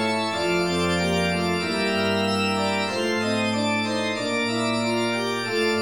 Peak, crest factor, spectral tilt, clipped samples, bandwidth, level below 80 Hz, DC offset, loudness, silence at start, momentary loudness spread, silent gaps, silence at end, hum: -10 dBFS; 12 dB; -4.5 dB/octave; under 0.1%; 16.5 kHz; -54 dBFS; 0.2%; -23 LUFS; 0 s; 2 LU; none; 0 s; none